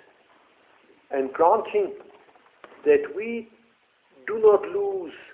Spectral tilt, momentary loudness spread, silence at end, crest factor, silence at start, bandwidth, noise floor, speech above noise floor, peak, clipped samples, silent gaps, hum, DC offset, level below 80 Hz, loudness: -9 dB/octave; 14 LU; 0.1 s; 20 dB; 1.1 s; 3.7 kHz; -63 dBFS; 40 dB; -6 dBFS; under 0.1%; none; none; under 0.1%; -68 dBFS; -24 LUFS